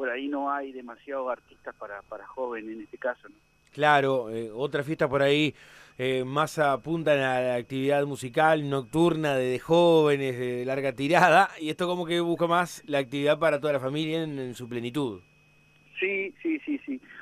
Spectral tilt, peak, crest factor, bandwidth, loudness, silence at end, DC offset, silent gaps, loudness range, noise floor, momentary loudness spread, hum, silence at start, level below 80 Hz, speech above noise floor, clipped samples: -5.5 dB/octave; -8 dBFS; 20 dB; 15.5 kHz; -26 LUFS; 0 s; under 0.1%; none; 8 LU; -60 dBFS; 15 LU; none; 0 s; -64 dBFS; 34 dB; under 0.1%